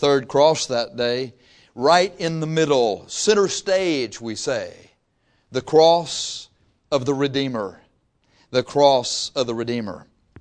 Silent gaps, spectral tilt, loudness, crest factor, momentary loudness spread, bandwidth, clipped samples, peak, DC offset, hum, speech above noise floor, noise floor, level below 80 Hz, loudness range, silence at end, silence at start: none; -4 dB/octave; -20 LUFS; 20 dB; 13 LU; 10.5 kHz; under 0.1%; -2 dBFS; under 0.1%; none; 45 dB; -65 dBFS; -60 dBFS; 2 LU; 0 s; 0 s